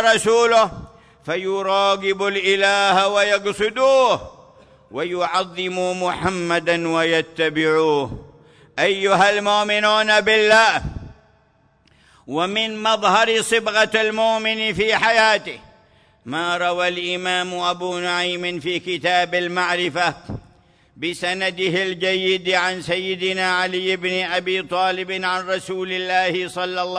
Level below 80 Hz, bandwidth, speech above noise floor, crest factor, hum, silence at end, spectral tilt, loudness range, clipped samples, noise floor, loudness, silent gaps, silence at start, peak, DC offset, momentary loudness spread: -50 dBFS; 11 kHz; 39 dB; 16 dB; none; 0 s; -3 dB/octave; 5 LU; under 0.1%; -58 dBFS; -19 LUFS; none; 0 s; -4 dBFS; under 0.1%; 10 LU